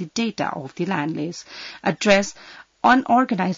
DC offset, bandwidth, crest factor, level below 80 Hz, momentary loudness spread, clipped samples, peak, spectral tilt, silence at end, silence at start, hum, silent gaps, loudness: under 0.1%; 7.8 kHz; 18 dB; -58 dBFS; 14 LU; under 0.1%; -4 dBFS; -4.5 dB/octave; 0 s; 0 s; none; none; -21 LUFS